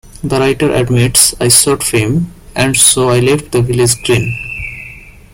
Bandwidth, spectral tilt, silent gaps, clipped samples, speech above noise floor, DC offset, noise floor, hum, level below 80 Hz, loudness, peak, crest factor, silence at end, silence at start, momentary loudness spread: over 20 kHz; -3.5 dB/octave; none; 0.3%; 22 dB; under 0.1%; -33 dBFS; none; -34 dBFS; -10 LUFS; 0 dBFS; 12 dB; 0.25 s; 0.05 s; 14 LU